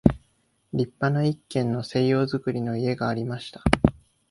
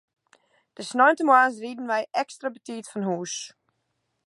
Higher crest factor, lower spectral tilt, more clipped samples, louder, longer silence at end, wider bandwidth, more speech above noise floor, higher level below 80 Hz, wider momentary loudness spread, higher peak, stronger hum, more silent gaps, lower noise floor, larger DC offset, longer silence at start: about the same, 24 dB vs 22 dB; first, -7.5 dB/octave vs -3.5 dB/octave; neither; about the same, -25 LUFS vs -24 LUFS; second, 0.4 s vs 0.8 s; about the same, 11.5 kHz vs 11.5 kHz; second, 43 dB vs 52 dB; first, -40 dBFS vs -84 dBFS; second, 7 LU vs 17 LU; first, 0 dBFS vs -4 dBFS; neither; neither; second, -67 dBFS vs -76 dBFS; neither; second, 0.05 s vs 0.8 s